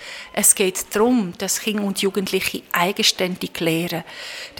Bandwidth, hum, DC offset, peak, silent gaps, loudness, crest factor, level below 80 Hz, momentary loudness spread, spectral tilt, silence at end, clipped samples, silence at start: 18 kHz; none; under 0.1%; 0 dBFS; none; -20 LUFS; 20 dB; -58 dBFS; 11 LU; -2.5 dB/octave; 0 s; under 0.1%; 0 s